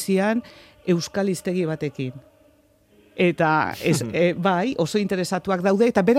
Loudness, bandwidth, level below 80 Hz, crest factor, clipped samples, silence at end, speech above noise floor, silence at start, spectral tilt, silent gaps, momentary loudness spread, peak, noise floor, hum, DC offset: -22 LUFS; 15.5 kHz; -60 dBFS; 16 dB; under 0.1%; 0 s; 36 dB; 0 s; -6 dB/octave; none; 9 LU; -6 dBFS; -58 dBFS; none; under 0.1%